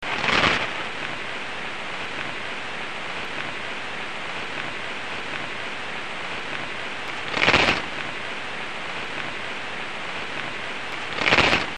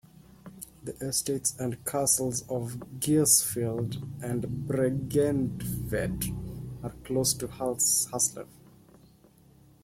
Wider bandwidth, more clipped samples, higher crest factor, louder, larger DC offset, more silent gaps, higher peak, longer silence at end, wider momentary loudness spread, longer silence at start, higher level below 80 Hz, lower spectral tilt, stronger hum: second, 10 kHz vs 16.5 kHz; neither; about the same, 26 dB vs 22 dB; first, -25 LUFS vs -28 LUFS; first, 2% vs under 0.1%; neither; first, 0 dBFS vs -8 dBFS; second, 0 s vs 1.4 s; second, 12 LU vs 16 LU; second, 0 s vs 0.45 s; about the same, -50 dBFS vs -52 dBFS; about the same, -3 dB/octave vs -4 dB/octave; neither